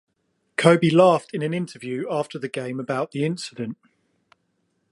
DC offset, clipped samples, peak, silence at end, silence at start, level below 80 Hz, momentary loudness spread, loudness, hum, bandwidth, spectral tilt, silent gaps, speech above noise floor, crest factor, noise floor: under 0.1%; under 0.1%; 0 dBFS; 1.2 s; 0.6 s; -70 dBFS; 15 LU; -22 LUFS; none; 11.5 kHz; -6 dB/octave; none; 50 dB; 22 dB; -72 dBFS